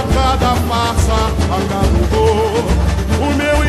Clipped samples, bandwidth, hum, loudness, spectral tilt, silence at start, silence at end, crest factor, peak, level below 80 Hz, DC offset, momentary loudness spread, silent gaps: under 0.1%; 13.5 kHz; none; -15 LUFS; -5.5 dB/octave; 0 s; 0 s; 12 dB; -2 dBFS; -18 dBFS; under 0.1%; 3 LU; none